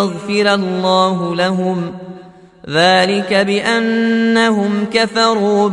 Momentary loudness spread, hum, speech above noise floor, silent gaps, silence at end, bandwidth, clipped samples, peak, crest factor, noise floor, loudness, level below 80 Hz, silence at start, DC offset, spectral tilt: 7 LU; none; 25 dB; none; 0 s; 11.5 kHz; under 0.1%; 0 dBFS; 14 dB; -39 dBFS; -14 LUFS; -60 dBFS; 0 s; under 0.1%; -5 dB/octave